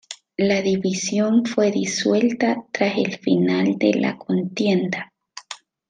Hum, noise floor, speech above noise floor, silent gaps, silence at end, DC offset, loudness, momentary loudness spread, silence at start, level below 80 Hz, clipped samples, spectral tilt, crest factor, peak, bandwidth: none; -41 dBFS; 21 dB; none; 0.35 s; under 0.1%; -21 LUFS; 13 LU; 0.1 s; -64 dBFS; under 0.1%; -5 dB/octave; 16 dB; -4 dBFS; 9.6 kHz